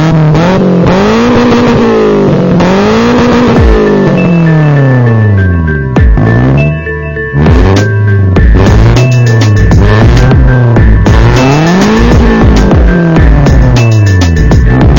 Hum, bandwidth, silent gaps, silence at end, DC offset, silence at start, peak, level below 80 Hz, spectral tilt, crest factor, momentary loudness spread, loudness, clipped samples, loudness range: none; 16.5 kHz; none; 0 s; under 0.1%; 0 s; 0 dBFS; -10 dBFS; -7.5 dB/octave; 4 dB; 2 LU; -6 LUFS; 2%; 2 LU